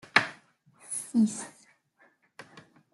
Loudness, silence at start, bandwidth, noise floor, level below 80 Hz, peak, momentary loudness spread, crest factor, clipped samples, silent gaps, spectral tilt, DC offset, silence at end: -29 LUFS; 0.15 s; 12 kHz; -66 dBFS; -78 dBFS; -4 dBFS; 25 LU; 28 dB; under 0.1%; none; -3 dB/octave; under 0.1%; 0.35 s